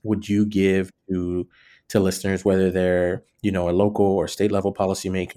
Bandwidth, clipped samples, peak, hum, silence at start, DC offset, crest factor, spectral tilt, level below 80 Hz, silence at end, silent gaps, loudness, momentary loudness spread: 15 kHz; under 0.1%; -4 dBFS; none; 0.05 s; under 0.1%; 16 dB; -6.5 dB/octave; -56 dBFS; 0.05 s; none; -22 LUFS; 8 LU